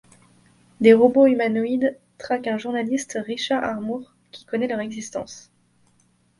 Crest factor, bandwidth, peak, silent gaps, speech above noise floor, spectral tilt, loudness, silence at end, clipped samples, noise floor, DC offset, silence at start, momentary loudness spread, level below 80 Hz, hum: 20 dB; 11.5 kHz; -2 dBFS; none; 42 dB; -5 dB/octave; -21 LUFS; 1 s; under 0.1%; -62 dBFS; under 0.1%; 0.8 s; 17 LU; -66 dBFS; none